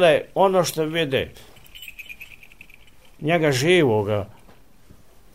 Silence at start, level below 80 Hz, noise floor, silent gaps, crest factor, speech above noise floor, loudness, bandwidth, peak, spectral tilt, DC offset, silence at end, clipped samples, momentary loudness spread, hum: 0 s; -54 dBFS; -52 dBFS; none; 18 dB; 33 dB; -20 LUFS; 16 kHz; -4 dBFS; -5 dB/octave; 0.4%; 1.1 s; under 0.1%; 21 LU; none